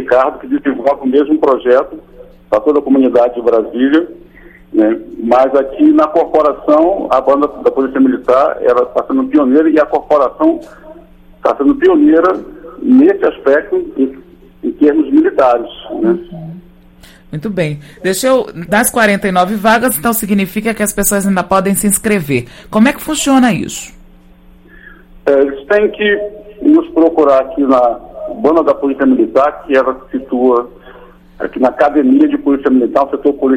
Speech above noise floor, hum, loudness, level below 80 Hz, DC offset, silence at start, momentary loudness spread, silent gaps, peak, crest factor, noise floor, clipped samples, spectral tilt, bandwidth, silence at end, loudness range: 30 dB; none; -12 LUFS; -42 dBFS; under 0.1%; 0 s; 10 LU; none; 0 dBFS; 12 dB; -41 dBFS; under 0.1%; -5 dB/octave; 16.5 kHz; 0 s; 3 LU